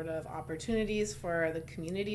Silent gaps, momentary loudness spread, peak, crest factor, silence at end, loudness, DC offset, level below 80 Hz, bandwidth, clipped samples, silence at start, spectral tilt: none; 7 LU; -20 dBFS; 14 dB; 0 s; -35 LUFS; under 0.1%; -54 dBFS; 12 kHz; under 0.1%; 0 s; -5 dB/octave